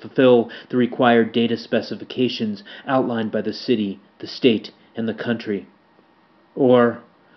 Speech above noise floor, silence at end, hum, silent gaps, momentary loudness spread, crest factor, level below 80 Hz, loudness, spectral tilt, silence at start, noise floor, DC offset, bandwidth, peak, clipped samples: 36 dB; 0.35 s; none; none; 14 LU; 20 dB; -72 dBFS; -20 LUFS; -4.5 dB/octave; 0 s; -56 dBFS; under 0.1%; 6.2 kHz; -2 dBFS; under 0.1%